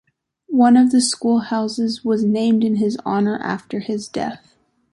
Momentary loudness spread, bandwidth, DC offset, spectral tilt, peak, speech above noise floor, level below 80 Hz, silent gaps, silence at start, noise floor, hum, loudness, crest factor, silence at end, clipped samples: 12 LU; 11.5 kHz; under 0.1%; -5 dB/octave; -4 dBFS; 22 dB; -62 dBFS; none; 0.5 s; -40 dBFS; none; -18 LUFS; 16 dB; 0.55 s; under 0.1%